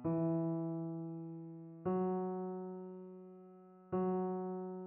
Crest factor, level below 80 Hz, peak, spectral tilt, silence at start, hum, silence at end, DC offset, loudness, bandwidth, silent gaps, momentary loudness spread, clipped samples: 12 dB; -76 dBFS; -26 dBFS; -11.5 dB/octave; 0 s; none; 0 s; under 0.1%; -40 LUFS; 3 kHz; none; 18 LU; under 0.1%